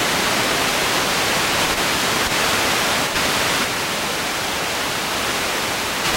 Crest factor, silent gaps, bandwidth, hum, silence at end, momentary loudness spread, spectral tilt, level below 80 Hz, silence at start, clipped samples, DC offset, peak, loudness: 14 dB; none; 16.5 kHz; none; 0 s; 4 LU; -1.5 dB/octave; -44 dBFS; 0 s; under 0.1%; under 0.1%; -6 dBFS; -18 LUFS